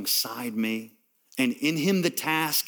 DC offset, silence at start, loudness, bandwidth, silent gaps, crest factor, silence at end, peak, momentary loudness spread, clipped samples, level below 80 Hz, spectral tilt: under 0.1%; 0 s; -26 LUFS; over 20 kHz; none; 18 dB; 0 s; -10 dBFS; 6 LU; under 0.1%; -80 dBFS; -3.5 dB/octave